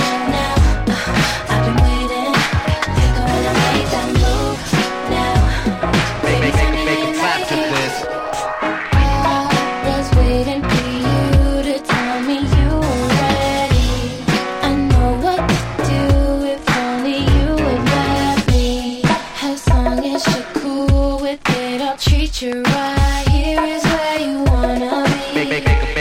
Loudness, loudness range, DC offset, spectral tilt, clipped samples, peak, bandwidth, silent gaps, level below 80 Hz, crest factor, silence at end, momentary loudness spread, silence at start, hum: -17 LUFS; 1 LU; under 0.1%; -5.5 dB/octave; under 0.1%; -2 dBFS; 16 kHz; none; -22 dBFS; 14 dB; 0 s; 4 LU; 0 s; none